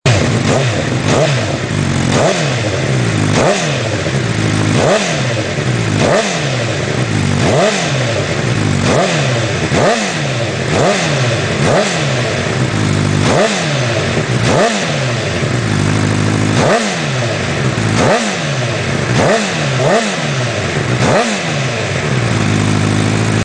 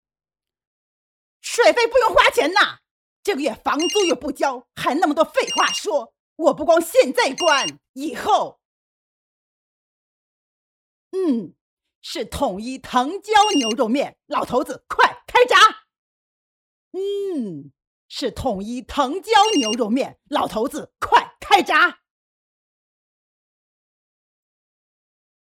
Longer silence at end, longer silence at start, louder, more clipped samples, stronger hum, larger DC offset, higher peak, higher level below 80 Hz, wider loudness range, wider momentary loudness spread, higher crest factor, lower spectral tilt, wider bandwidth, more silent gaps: second, 0 s vs 3.55 s; second, 0.05 s vs 1.45 s; first, -14 LUFS vs -19 LUFS; neither; neither; neither; about the same, 0 dBFS vs 0 dBFS; first, -38 dBFS vs -52 dBFS; second, 1 LU vs 10 LU; second, 4 LU vs 13 LU; second, 14 dB vs 20 dB; first, -5 dB/octave vs -2.5 dB/octave; second, 10.5 kHz vs 16.5 kHz; second, none vs 2.91-3.23 s, 6.20-6.36 s, 7.89-7.94 s, 8.65-11.11 s, 11.61-11.77 s, 11.95-12.02 s, 15.98-16.91 s, 17.87-18.09 s